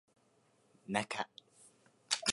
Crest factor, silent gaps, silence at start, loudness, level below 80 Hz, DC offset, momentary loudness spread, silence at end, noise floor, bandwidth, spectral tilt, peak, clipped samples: 30 dB; none; 0.9 s; -38 LUFS; -82 dBFS; under 0.1%; 22 LU; 0 s; -72 dBFS; 11.5 kHz; -2 dB/octave; -12 dBFS; under 0.1%